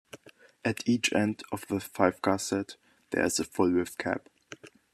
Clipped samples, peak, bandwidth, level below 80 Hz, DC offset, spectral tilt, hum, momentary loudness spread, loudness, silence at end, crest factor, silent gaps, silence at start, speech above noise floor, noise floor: under 0.1%; -6 dBFS; 14.5 kHz; -68 dBFS; under 0.1%; -4 dB/octave; none; 21 LU; -29 LUFS; 0.25 s; 24 dB; none; 0.15 s; 26 dB; -54 dBFS